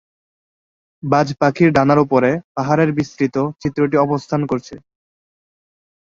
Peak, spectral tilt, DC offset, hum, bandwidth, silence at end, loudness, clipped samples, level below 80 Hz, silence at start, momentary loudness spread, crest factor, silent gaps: -2 dBFS; -7.5 dB/octave; under 0.1%; none; 7.6 kHz; 1.25 s; -17 LUFS; under 0.1%; -52 dBFS; 1.05 s; 8 LU; 16 dB; 2.44-2.55 s